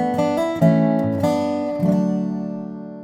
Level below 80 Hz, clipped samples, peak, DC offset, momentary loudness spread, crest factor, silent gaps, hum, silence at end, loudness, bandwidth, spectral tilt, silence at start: -60 dBFS; under 0.1%; -4 dBFS; under 0.1%; 11 LU; 14 dB; none; none; 0 s; -20 LUFS; 14.5 kHz; -8 dB/octave; 0 s